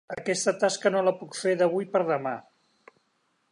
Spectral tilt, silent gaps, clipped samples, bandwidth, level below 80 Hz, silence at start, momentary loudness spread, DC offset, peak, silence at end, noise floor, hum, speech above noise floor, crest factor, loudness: -4 dB/octave; none; under 0.1%; 11.5 kHz; -76 dBFS; 0.1 s; 6 LU; under 0.1%; -10 dBFS; 1.1 s; -72 dBFS; none; 46 dB; 18 dB; -26 LUFS